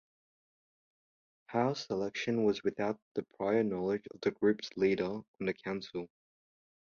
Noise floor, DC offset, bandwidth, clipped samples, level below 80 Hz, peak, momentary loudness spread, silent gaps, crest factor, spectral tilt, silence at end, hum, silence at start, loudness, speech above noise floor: under -90 dBFS; under 0.1%; 7.2 kHz; under 0.1%; -70 dBFS; -16 dBFS; 8 LU; 3.02-3.15 s, 5.28-5.34 s; 18 dB; -6 dB/octave; 0.8 s; none; 1.5 s; -34 LUFS; over 57 dB